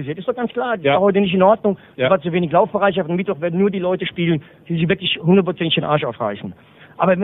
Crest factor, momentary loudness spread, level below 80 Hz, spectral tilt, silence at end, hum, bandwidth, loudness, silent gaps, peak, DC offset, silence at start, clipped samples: 18 dB; 9 LU; -54 dBFS; -10.5 dB/octave; 0 s; none; 4 kHz; -18 LUFS; none; 0 dBFS; under 0.1%; 0 s; under 0.1%